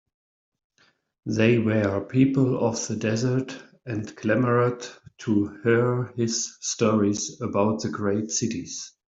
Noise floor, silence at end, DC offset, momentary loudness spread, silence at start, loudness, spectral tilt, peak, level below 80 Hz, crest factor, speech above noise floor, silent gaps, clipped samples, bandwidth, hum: -65 dBFS; 0.2 s; under 0.1%; 12 LU; 1.25 s; -24 LUFS; -5.5 dB/octave; -6 dBFS; -62 dBFS; 18 dB; 41 dB; none; under 0.1%; 8 kHz; none